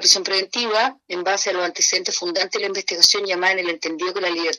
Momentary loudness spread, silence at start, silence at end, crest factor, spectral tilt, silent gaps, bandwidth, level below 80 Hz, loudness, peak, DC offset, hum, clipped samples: 9 LU; 0 s; 0 s; 20 dB; 0.5 dB/octave; none; 13 kHz; -76 dBFS; -19 LUFS; 0 dBFS; under 0.1%; none; under 0.1%